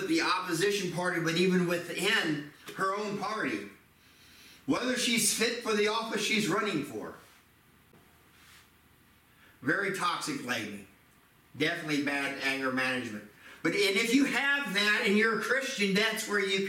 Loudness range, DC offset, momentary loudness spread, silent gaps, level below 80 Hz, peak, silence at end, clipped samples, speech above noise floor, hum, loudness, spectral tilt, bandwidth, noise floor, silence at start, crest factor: 8 LU; under 0.1%; 10 LU; none; -72 dBFS; -14 dBFS; 0 s; under 0.1%; 32 dB; none; -29 LUFS; -3.5 dB/octave; 16.5 kHz; -62 dBFS; 0 s; 18 dB